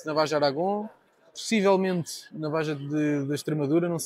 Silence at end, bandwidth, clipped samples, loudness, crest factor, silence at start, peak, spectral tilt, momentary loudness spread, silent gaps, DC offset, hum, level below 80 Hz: 0 s; 15.5 kHz; under 0.1%; -27 LUFS; 16 dB; 0 s; -10 dBFS; -5.5 dB/octave; 12 LU; none; under 0.1%; none; -76 dBFS